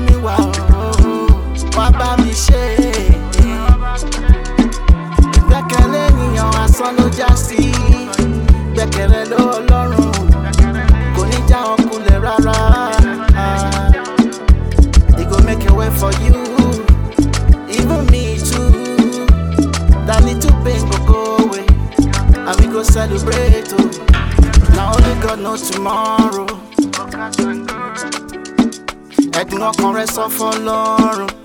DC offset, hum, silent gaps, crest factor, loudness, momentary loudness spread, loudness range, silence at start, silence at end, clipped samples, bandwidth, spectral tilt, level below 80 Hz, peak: under 0.1%; none; none; 12 dB; -14 LUFS; 5 LU; 4 LU; 0 s; 0.1 s; under 0.1%; 18 kHz; -6 dB/octave; -14 dBFS; 0 dBFS